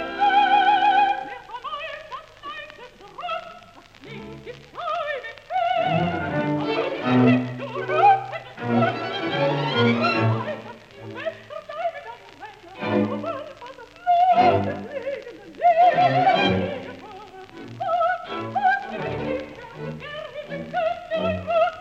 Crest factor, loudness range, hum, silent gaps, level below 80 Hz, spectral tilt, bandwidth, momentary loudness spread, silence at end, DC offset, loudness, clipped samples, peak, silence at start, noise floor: 18 dB; 9 LU; none; none; -58 dBFS; -7 dB/octave; 8 kHz; 22 LU; 0 s; under 0.1%; -22 LUFS; under 0.1%; -6 dBFS; 0 s; -47 dBFS